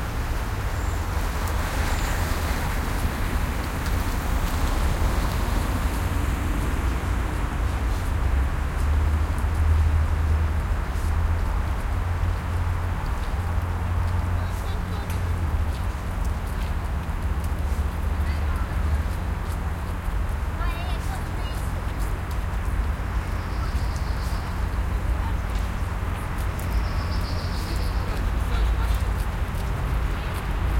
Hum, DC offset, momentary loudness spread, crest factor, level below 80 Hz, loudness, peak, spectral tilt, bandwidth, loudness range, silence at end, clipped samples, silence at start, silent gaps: none; under 0.1%; 4 LU; 14 dB; -26 dBFS; -27 LUFS; -10 dBFS; -6 dB/octave; 16.5 kHz; 4 LU; 0 s; under 0.1%; 0 s; none